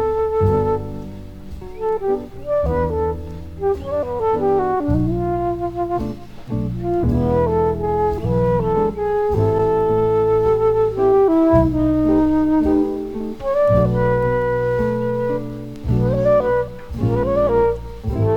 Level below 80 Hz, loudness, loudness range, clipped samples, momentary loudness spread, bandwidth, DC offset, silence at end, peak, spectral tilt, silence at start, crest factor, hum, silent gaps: -32 dBFS; -19 LUFS; 5 LU; under 0.1%; 10 LU; 15.5 kHz; under 0.1%; 0 s; -2 dBFS; -9.5 dB/octave; 0 s; 16 dB; none; none